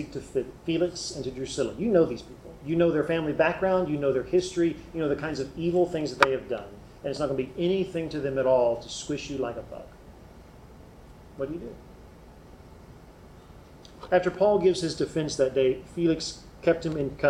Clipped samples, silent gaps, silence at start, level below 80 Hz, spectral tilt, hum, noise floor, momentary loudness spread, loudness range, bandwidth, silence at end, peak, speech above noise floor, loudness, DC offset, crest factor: under 0.1%; none; 0 s; -52 dBFS; -5.5 dB/octave; none; -49 dBFS; 13 LU; 16 LU; 13.5 kHz; 0 s; -4 dBFS; 23 dB; -27 LUFS; under 0.1%; 24 dB